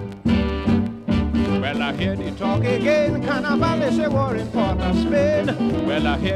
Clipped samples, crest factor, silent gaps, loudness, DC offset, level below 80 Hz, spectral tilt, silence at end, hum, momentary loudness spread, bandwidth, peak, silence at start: under 0.1%; 14 dB; none; -21 LUFS; under 0.1%; -34 dBFS; -7 dB/octave; 0 s; none; 4 LU; 11 kHz; -6 dBFS; 0 s